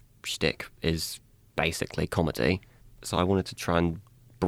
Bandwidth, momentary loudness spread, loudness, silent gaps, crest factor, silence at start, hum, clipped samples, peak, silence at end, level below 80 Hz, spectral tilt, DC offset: 17 kHz; 9 LU; -29 LUFS; none; 20 dB; 0.25 s; none; under 0.1%; -10 dBFS; 0 s; -50 dBFS; -5 dB/octave; under 0.1%